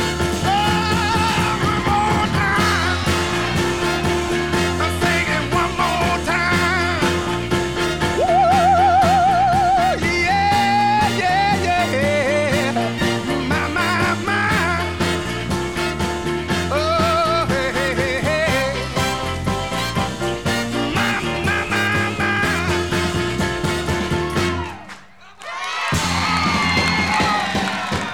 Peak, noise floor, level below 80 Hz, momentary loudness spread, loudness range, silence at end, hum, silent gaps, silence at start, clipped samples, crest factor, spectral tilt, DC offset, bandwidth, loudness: -4 dBFS; -42 dBFS; -36 dBFS; 6 LU; 5 LU; 0 s; none; none; 0 s; under 0.1%; 14 dB; -4.5 dB/octave; 0.6%; 19.5 kHz; -18 LUFS